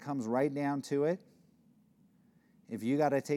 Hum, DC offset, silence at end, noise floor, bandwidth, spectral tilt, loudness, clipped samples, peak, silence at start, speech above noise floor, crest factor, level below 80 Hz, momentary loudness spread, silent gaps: none; under 0.1%; 0 s; -67 dBFS; 14 kHz; -7 dB/octave; -33 LUFS; under 0.1%; -18 dBFS; 0 s; 34 dB; 18 dB; -86 dBFS; 9 LU; none